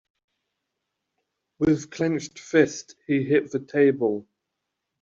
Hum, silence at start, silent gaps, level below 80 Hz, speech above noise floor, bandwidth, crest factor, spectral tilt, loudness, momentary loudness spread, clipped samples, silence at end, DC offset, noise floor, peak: none; 1.6 s; none; -60 dBFS; 59 dB; 7.6 kHz; 20 dB; -6 dB/octave; -24 LUFS; 8 LU; under 0.1%; 0.8 s; under 0.1%; -82 dBFS; -6 dBFS